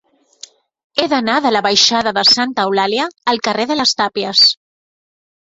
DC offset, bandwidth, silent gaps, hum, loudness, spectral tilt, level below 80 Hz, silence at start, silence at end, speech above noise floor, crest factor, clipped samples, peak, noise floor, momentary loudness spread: under 0.1%; 8 kHz; none; none; -13 LUFS; -2 dB/octave; -58 dBFS; 0.95 s; 0.95 s; 27 dB; 16 dB; under 0.1%; 0 dBFS; -41 dBFS; 8 LU